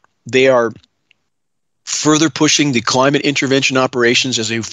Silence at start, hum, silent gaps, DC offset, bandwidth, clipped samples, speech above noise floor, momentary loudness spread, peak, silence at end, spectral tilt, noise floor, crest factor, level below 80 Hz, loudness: 0.25 s; none; none; under 0.1%; 11.5 kHz; under 0.1%; 63 dB; 6 LU; 0 dBFS; 0 s; -3.5 dB/octave; -77 dBFS; 14 dB; -62 dBFS; -13 LUFS